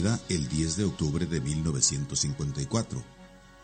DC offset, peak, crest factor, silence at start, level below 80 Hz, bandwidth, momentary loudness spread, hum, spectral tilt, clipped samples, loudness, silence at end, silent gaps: under 0.1%; -10 dBFS; 20 dB; 0 s; -46 dBFS; 9.2 kHz; 8 LU; none; -4.5 dB/octave; under 0.1%; -29 LUFS; 0 s; none